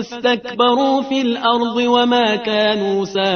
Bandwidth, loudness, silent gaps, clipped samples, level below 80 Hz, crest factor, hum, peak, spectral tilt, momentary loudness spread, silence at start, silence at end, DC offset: 6.6 kHz; -16 LUFS; none; under 0.1%; -60 dBFS; 16 dB; none; -2 dBFS; -4.5 dB/octave; 5 LU; 0 s; 0 s; under 0.1%